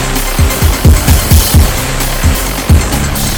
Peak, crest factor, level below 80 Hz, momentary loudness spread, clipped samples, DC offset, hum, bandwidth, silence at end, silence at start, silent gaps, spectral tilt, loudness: 0 dBFS; 8 dB; -12 dBFS; 6 LU; 1%; under 0.1%; none; 18.5 kHz; 0 s; 0 s; none; -4.5 dB/octave; -10 LUFS